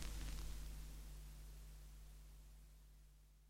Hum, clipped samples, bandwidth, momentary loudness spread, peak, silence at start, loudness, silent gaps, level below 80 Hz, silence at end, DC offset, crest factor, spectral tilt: none; under 0.1%; 16.5 kHz; 16 LU; -28 dBFS; 0 s; -57 LUFS; none; -54 dBFS; 0 s; under 0.1%; 24 dB; -4 dB/octave